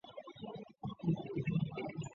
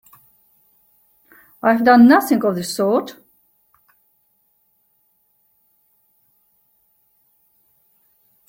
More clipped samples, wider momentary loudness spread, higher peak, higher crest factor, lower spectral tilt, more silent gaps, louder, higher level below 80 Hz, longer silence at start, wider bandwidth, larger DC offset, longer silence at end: neither; about the same, 12 LU vs 11 LU; second, -24 dBFS vs -2 dBFS; about the same, 16 dB vs 20 dB; first, -7.5 dB/octave vs -5 dB/octave; neither; second, -40 LUFS vs -15 LUFS; about the same, -68 dBFS vs -66 dBFS; second, 0.05 s vs 1.65 s; second, 7.2 kHz vs 16.5 kHz; neither; second, 0 s vs 5.35 s